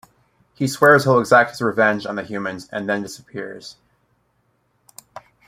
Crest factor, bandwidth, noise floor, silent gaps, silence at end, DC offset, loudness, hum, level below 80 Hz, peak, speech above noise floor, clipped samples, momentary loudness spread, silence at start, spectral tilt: 20 dB; 16 kHz; -66 dBFS; none; 0.3 s; under 0.1%; -18 LUFS; none; -62 dBFS; 0 dBFS; 47 dB; under 0.1%; 19 LU; 0.6 s; -5.5 dB/octave